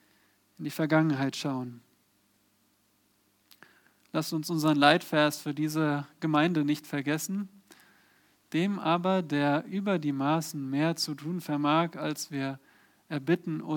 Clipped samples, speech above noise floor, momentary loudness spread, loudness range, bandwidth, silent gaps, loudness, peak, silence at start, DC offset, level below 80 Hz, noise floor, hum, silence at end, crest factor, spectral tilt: under 0.1%; 41 dB; 10 LU; 6 LU; 19.5 kHz; none; -29 LUFS; -6 dBFS; 0.6 s; under 0.1%; -82 dBFS; -69 dBFS; none; 0 s; 24 dB; -5.5 dB/octave